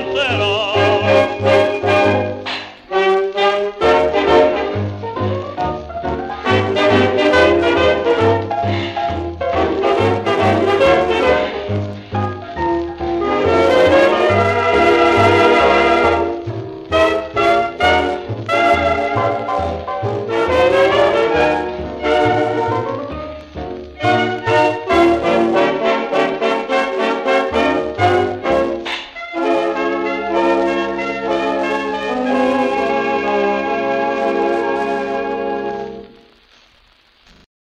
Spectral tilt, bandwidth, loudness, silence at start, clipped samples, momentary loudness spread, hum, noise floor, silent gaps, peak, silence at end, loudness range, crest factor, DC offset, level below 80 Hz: -6 dB/octave; 11.5 kHz; -16 LUFS; 0 s; under 0.1%; 10 LU; none; -52 dBFS; none; -2 dBFS; 1.6 s; 5 LU; 14 dB; under 0.1%; -40 dBFS